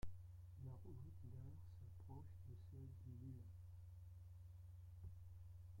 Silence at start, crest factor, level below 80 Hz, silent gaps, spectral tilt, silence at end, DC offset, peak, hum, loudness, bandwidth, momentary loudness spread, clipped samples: 0 s; 18 dB; -66 dBFS; none; -8.5 dB/octave; 0 s; under 0.1%; -38 dBFS; none; -60 LUFS; 16.5 kHz; 4 LU; under 0.1%